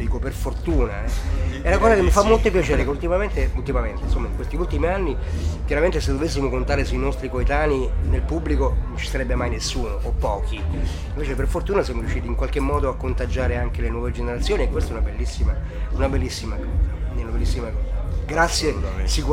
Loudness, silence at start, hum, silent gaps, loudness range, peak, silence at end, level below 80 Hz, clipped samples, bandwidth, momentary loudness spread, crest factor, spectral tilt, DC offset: -23 LUFS; 0 s; none; none; 5 LU; -2 dBFS; 0 s; -24 dBFS; under 0.1%; 12.5 kHz; 7 LU; 18 dB; -5.5 dB/octave; under 0.1%